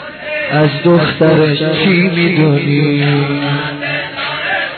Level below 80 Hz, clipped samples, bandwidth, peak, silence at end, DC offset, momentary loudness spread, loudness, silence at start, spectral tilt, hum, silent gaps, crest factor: -50 dBFS; under 0.1%; 4.5 kHz; 0 dBFS; 0 s; under 0.1%; 7 LU; -12 LUFS; 0 s; -10 dB/octave; none; none; 12 dB